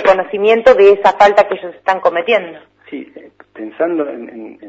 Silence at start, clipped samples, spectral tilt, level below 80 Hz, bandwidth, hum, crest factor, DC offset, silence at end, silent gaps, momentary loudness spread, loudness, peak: 0 s; 0.2%; -5 dB/octave; -52 dBFS; 8 kHz; none; 14 dB; under 0.1%; 0 s; none; 22 LU; -12 LUFS; 0 dBFS